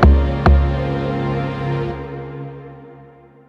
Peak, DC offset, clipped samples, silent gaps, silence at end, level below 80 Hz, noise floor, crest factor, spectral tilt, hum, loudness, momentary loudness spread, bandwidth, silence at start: 0 dBFS; under 0.1%; under 0.1%; none; 0.45 s; -20 dBFS; -44 dBFS; 18 dB; -9 dB/octave; none; -19 LUFS; 20 LU; 5.6 kHz; 0 s